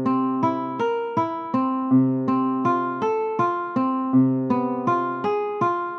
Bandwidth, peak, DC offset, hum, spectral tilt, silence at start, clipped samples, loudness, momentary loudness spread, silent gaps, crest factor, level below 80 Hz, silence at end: 6.4 kHz; -8 dBFS; under 0.1%; none; -9 dB/octave; 0 s; under 0.1%; -23 LUFS; 5 LU; none; 14 dB; -70 dBFS; 0 s